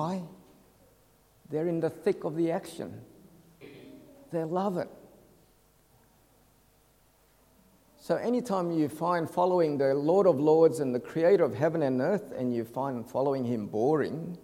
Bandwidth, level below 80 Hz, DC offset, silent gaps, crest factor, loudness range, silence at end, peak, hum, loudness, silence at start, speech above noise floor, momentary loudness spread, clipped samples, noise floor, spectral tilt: 16.5 kHz; -70 dBFS; under 0.1%; none; 20 dB; 13 LU; 0.05 s; -10 dBFS; none; -28 LUFS; 0 s; 36 dB; 14 LU; under 0.1%; -64 dBFS; -7.5 dB/octave